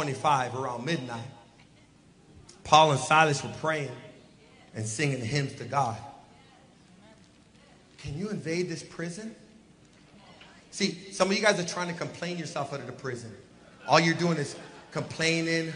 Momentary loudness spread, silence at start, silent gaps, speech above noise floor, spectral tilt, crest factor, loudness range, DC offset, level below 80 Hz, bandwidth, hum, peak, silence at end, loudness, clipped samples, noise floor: 20 LU; 0 s; none; 30 dB; -4.5 dB/octave; 26 dB; 11 LU; under 0.1%; -64 dBFS; 10.5 kHz; none; -4 dBFS; 0 s; -28 LUFS; under 0.1%; -58 dBFS